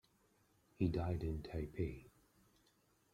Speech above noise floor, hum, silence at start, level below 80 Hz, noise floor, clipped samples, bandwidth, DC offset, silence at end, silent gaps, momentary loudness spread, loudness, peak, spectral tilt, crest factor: 35 dB; none; 0.8 s; -56 dBFS; -76 dBFS; under 0.1%; 13 kHz; under 0.1%; 1.05 s; none; 7 LU; -42 LUFS; -24 dBFS; -8.5 dB/octave; 20 dB